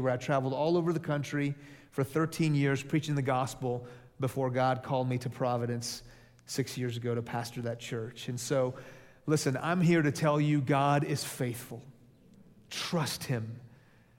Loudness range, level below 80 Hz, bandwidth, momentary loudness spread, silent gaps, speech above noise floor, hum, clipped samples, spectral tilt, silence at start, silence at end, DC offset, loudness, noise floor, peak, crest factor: 6 LU; -66 dBFS; 16.5 kHz; 13 LU; none; 29 dB; none; under 0.1%; -6 dB/octave; 0 s; 0.5 s; under 0.1%; -31 LUFS; -59 dBFS; -14 dBFS; 18 dB